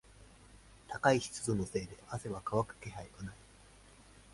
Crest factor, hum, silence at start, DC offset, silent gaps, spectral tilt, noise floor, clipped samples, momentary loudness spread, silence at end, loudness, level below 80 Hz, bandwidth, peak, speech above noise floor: 24 dB; none; 0.1 s; under 0.1%; none; -5 dB/octave; -59 dBFS; under 0.1%; 18 LU; 0.3 s; -36 LUFS; -60 dBFS; 11.5 kHz; -14 dBFS; 24 dB